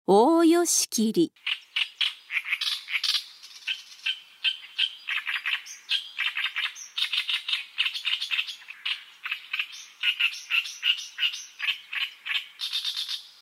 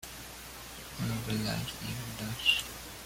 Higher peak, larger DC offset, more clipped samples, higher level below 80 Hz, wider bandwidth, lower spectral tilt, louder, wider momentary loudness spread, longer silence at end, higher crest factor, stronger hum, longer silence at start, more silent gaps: first, -8 dBFS vs -12 dBFS; neither; neither; second, -88 dBFS vs -54 dBFS; about the same, 16 kHz vs 16.5 kHz; second, -1.5 dB/octave vs -3.5 dB/octave; first, -26 LUFS vs -33 LUFS; second, 9 LU vs 16 LU; about the same, 0.1 s vs 0 s; about the same, 20 dB vs 24 dB; neither; about the same, 0.1 s vs 0 s; neither